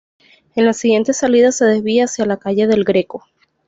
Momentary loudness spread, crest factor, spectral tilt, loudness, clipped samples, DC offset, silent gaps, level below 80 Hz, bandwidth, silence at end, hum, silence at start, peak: 7 LU; 12 dB; -4.5 dB/octave; -15 LUFS; under 0.1%; under 0.1%; none; -58 dBFS; 8 kHz; 0.5 s; none; 0.55 s; -2 dBFS